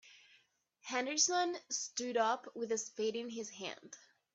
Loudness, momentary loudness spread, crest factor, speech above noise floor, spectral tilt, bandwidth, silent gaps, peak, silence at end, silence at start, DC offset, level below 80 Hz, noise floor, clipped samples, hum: -36 LUFS; 18 LU; 20 dB; 35 dB; -1 dB/octave; 8.4 kHz; none; -18 dBFS; 0.35 s; 0.05 s; under 0.1%; -88 dBFS; -72 dBFS; under 0.1%; none